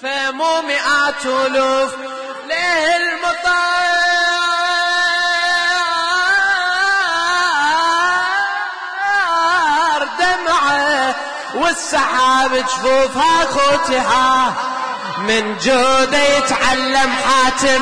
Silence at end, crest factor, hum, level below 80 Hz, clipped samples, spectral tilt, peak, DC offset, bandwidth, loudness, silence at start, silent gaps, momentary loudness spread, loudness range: 0 s; 10 dB; none; -46 dBFS; under 0.1%; -1.5 dB/octave; -4 dBFS; under 0.1%; 10.5 kHz; -15 LUFS; 0 s; none; 6 LU; 2 LU